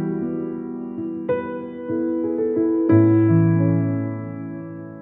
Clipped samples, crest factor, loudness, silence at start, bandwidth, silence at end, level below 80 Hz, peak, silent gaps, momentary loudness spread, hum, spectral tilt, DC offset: under 0.1%; 16 dB; -21 LUFS; 0 s; 3.2 kHz; 0 s; -60 dBFS; -4 dBFS; none; 15 LU; none; -13.5 dB/octave; under 0.1%